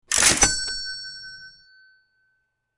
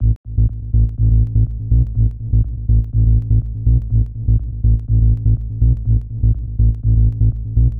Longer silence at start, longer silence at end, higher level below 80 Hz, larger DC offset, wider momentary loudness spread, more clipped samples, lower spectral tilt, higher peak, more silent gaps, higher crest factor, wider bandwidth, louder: about the same, 0.1 s vs 0 s; first, 1.3 s vs 0 s; second, -44 dBFS vs -16 dBFS; second, under 0.1% vs 1%; first, 24 LU vs 4 LU; neither; second, 0 dB/octave vs -14 dB/octave; about the same, -2 dBFS vs -4 dBFS; second, none vs 0.16-0.24 s; first, 24 dB vs 10 dB; first, 11.5 kHz vs 0.8 kHz; about the same, -19 LUFS vs -17 LUFS